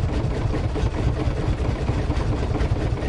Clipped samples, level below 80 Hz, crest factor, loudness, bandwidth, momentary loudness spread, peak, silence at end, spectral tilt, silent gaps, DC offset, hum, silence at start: under 0.1%; -26 dBFS; 12 dB; -24 LUFS; 10.5 kHz; 1 LU; -10 dBFS; 0 s; -7.5 dB/octave; none; under 0.1%; none; 0 s